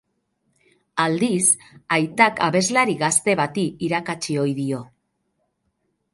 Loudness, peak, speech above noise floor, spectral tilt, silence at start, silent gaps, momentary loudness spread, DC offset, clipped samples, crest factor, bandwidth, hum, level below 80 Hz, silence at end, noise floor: -20 LUFS; -2 dBFS; 51 dB; -3.5 dB/octave; 0.95 s; none; 8 LU; under 0.1%; under 0.1%; 20 dB; 11.5 kHz; none; -64 dBFS; 1.3 s; -72 dBFS